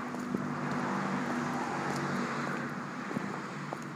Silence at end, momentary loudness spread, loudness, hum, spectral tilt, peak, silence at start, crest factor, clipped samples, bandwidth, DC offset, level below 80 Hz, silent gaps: 0 s; 5 LU; -35 LUFS; none; -5.5 dB/octave; -18 dBFS; 0 s; 16 dB; under 0.1%; 16 kHz; under 0.1%; -74 dBFS; none